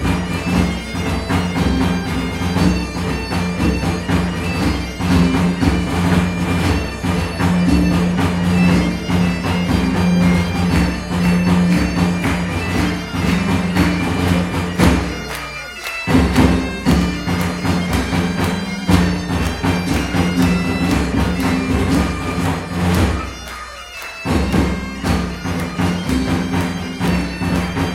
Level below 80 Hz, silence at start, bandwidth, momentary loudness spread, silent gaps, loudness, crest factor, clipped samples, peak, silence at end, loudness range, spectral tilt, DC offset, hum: -28 dBFS; 0 s; 16 kHz; 7 LU; none; -17 LUFS; 16 dB; under 0.1%; 0 dBFS; 0 s; 3 LU; -6 dB/octave; under 0.1%; none